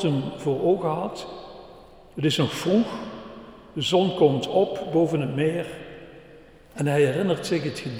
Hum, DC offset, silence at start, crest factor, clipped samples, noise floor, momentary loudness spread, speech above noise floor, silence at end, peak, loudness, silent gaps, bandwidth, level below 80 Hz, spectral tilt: none; under 0.1%; 0 s; 20 dB; under 0.1%; -49 dBFS; 20 LU; 25 dB; 0 s; -4 dBFS; -24 LUFS; none; 16 kHz; -56 dBFS; -6 dB/octave